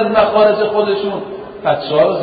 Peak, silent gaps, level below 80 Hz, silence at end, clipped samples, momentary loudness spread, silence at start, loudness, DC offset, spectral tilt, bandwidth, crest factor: -2 dBFS; none; -50 dBFS; 0 s; under 0.1%; 11 LU; 0 s; -14 LUFS; under 0.1%; -11 dB/octave; 5 kHz; 12 dB